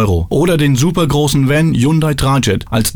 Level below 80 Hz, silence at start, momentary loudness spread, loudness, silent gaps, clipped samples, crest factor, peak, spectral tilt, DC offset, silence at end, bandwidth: -30 dBFS; 0 s; 2 LU; -13 LUFS; none; under 0.1%; 12 dB; 0 dBFS; -5.5 dB/octave; under 0.1%; 0 s; over 20 kHz